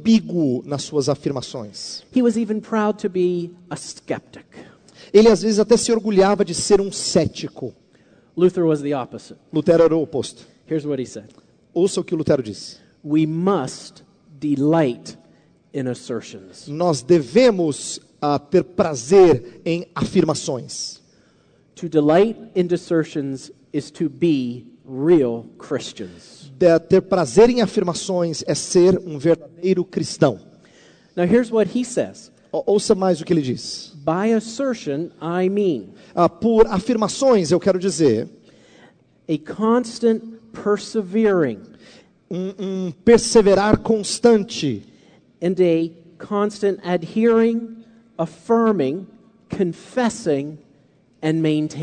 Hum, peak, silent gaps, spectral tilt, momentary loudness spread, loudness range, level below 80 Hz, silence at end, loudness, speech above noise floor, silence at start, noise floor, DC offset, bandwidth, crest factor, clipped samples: none; 0 dBFS; none; -5.5 dB/octave; 15 LU; 5 LU; -50 dBFS; 0 s; -19 LUFS; 37 dB; 0 s; -56 dBFS; under 0.1%; 9.4 kHz; 20 dB; under 0.1%